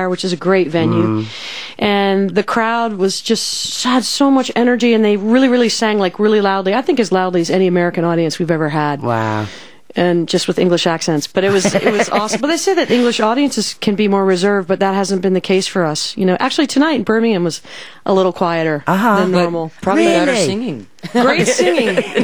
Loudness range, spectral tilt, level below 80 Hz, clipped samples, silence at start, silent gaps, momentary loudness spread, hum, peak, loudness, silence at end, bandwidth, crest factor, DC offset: 3 LU; -4.5 dB/octave; -56 dBFS; under 0.1%; 0 s; none; 5 LU; none; 0 dBFS; -15 LUFS; 0 s; over 20 kHz; 14 dB; 0.9%